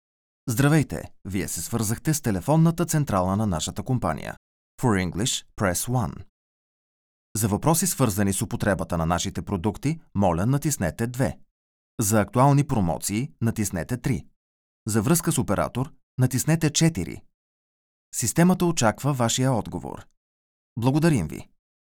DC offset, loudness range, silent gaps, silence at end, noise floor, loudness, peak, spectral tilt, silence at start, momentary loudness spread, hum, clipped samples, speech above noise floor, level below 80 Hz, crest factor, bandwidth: under 0.1%; 2 LU; 4.37-4.78 s, 6.29-7.35 s, 11.51-11.98 s, 14.36-14.86 s, 16.03-16.18 s, 17.34-18.12 s, 20.17-20.76 s; 0.45 s; under -90 dBFS; -24 LUFS; -6 dBFS; -5 dB/octave; 0.45 s; 12 LU; none; under 0.1%; over 67 dB; -46 dBFS; 20 dB; over 20 kHz